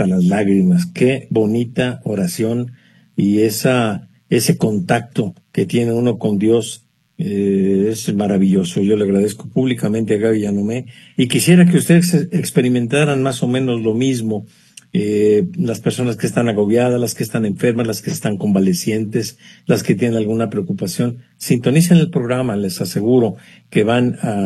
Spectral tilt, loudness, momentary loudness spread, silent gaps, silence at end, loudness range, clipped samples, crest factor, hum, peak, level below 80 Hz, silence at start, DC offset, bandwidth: -6 dB/octave; -16 LUFS; 8 LU; none; 0 s; 3 LU; under 0.1%; 16 dB; none; 0 dBFS; -56 dBFS; 0 s; under 0.1%; 13 kHz